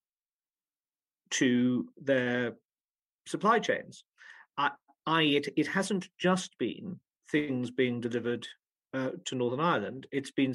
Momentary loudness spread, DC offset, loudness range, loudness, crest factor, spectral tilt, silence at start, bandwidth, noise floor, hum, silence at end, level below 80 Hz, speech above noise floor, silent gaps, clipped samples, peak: 13 LU; under 0.1%; 3 LU; -31 LUFS; 18 dB; -4.5 dB/octave; 1.3 s; 12 kHz; under -90 dBFS; none; 0 s; -78 dBFS; over 60 dB; 2.65-2.69 s, 2.95-2.99 s, 3.14-3.19 s; under 0.1%; -12 dBFS